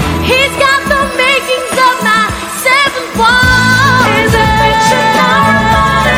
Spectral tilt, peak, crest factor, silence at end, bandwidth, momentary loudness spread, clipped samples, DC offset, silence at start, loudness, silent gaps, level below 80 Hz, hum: -4 dB/octave; 0 dBFS; 10 dB; 0 s; 18 kHz; 4 LU; 0.7%; under 0.1%; 0 s; -8 LUFS; none; -26 dBFS; none